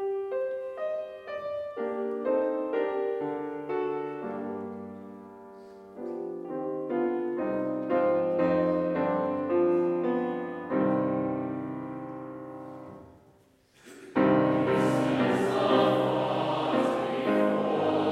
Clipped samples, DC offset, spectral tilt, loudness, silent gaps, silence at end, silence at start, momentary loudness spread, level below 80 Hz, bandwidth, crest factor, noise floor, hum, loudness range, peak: under 0.1%; under 0.1%; -7 dB/octave; -28 LUFS; none; 0 s; 0 s; 16 LU; -68 dBFS; 12.5 kHz; 18 dB; -61 dBFS; none; 9 LU; -10 dBFS